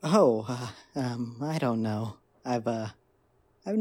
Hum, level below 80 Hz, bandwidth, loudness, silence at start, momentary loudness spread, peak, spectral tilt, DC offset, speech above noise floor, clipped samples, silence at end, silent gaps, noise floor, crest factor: none; -70 dBFS; 16.5 kHz; -30 LUFS; 0.05 s; 16 LU; -10 dBFS; -7 dB/octave; under 0.1%; 39 dB; under 0.1%; 0 s; none; -67 dBFS; 20 dB